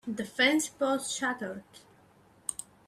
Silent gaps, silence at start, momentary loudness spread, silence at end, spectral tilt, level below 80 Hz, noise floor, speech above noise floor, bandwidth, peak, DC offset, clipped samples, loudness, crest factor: none; 0.05 s; 13 LU; 0.25 s; -2 dB/octave; -72 dBFS; -61 dBFS; 30 dB; 15.5 kHz; -12 dBFS; under 0.1%; under 0.1%; -30 LUFS; 22 dB